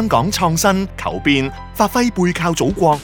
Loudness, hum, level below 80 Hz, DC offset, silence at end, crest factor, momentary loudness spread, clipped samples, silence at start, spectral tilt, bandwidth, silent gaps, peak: -17 LUFS; none; -36 dBFS; under 0.1%; 0 s; 16 dB; 5 LU; under 0.1%; 0 s; -4.5 dB/octave; 19.5 kHz; none; 0 dBFS